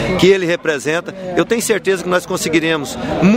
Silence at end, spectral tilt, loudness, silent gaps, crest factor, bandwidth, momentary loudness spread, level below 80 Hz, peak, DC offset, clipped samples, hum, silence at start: 0 s; -4.5 dB/octave; -16 LUFS; none; 16 dB; 16.5 kHz; 8 LU; -42 dBFS; 0 dBFS; under 0.1%; under 0.1%; none; 0 s